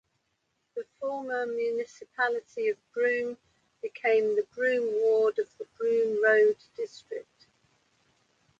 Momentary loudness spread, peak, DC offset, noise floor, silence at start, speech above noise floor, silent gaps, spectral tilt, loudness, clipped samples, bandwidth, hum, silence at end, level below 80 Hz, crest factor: 17 LU; -10 dBFS; under 0.1%; -77 dBFS; 0.75 s; 50 dB; none; -4 dB/octave; -28 LUFS; under 0.1%; 7.6 kHz; none; 1.4 s; -80 dBFS; 18 dB